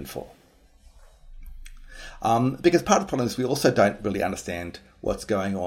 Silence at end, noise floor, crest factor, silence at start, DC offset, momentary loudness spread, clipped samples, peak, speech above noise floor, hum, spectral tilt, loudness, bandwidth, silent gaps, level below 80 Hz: 0 s; -54 dBFS; 22 dB; 0 s; under 0.1%; 17 LU; under 0.1%; -4 dBFS; 30 dB; none; -5 dB/octave; -24 LUFS; 16.5 kHz; none; -46 dBFS